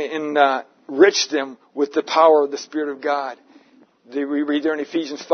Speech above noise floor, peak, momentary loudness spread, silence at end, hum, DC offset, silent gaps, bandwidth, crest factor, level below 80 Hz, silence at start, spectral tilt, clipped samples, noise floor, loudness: 34 dB; 0 dBFS; 13 LU; 0 s; none; under 0.1%; none; 6.6 kHz; 20 dB; -78 dBFS; 0 s; -2.5 dB/octave; under 0.1%; -53 dBFS; -19 LUFS